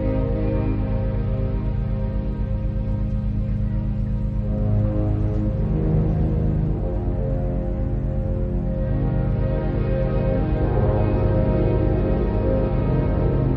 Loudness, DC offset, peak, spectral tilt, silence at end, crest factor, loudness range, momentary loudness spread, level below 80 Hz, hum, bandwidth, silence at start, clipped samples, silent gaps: -23 LUFS; under 0.1%; -8 dBFS; -11.5 dB/octave; 0 s; 12 dB; 4 LU; 5 LU; -26 dBFS; none; 4.6 kHz; 0 s; under 0.1%; none